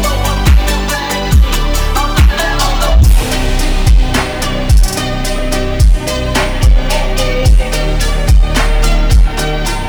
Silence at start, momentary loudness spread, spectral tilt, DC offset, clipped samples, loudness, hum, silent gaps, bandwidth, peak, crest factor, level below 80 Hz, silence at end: 0 s; 5 LU; -4.5 dB/octave; under 0.1%; under 0.1%; -13 LUFS; none; none; over 20 kHz; 0 dBFS; 10 dB; -10 dBFS; 0 s